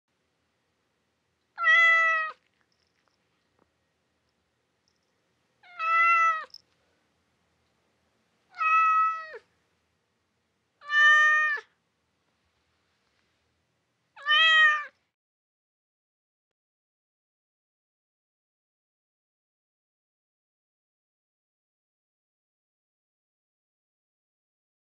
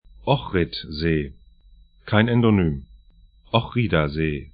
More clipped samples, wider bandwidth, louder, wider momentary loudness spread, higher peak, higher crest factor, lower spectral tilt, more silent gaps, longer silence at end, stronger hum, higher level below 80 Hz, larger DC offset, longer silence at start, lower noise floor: neither; first, 8 kHz vs 5.2 kHz; about the same, -21 LUFS vs -22 LUFS; first, 15 LU vs 8 LU; second, -10 dBFS vs -2 dBFS; about the same, 20 dB vs 22 dB; second, 3 dB/octave vs -11.5 dB/octave; neither; first, 10 s vs 0.05 s; neither; second, under -90 dBFS vs -40 dBFS; neither; first, 1.6 s vs 0.2 s; first, -76 dBFS vs -52 dBFS